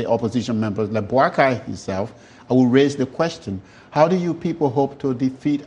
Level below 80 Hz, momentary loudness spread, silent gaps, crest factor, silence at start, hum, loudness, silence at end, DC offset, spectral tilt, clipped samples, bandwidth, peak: -56 dBFS; 11 LU; none; 18 dB; 0 s; none; -20 LUFS; 0 s; under 0.1%; -7 dB/octave; under 0.1%; 9.6 kHz; -2 dBFS